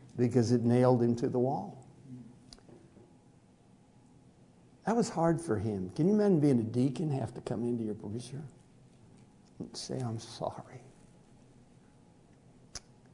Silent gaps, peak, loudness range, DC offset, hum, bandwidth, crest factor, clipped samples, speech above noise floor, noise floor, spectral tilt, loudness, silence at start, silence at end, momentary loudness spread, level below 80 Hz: none; -12 dBFS; 13 LU; under 0.1%; none; 11 kHz; 22 dB; under 0.1%; 31 dB; -61 dBFS; -7.5 dB/octave; -31 LUFS; 0 s; 0.35 s; 24 LU; -66 dBFS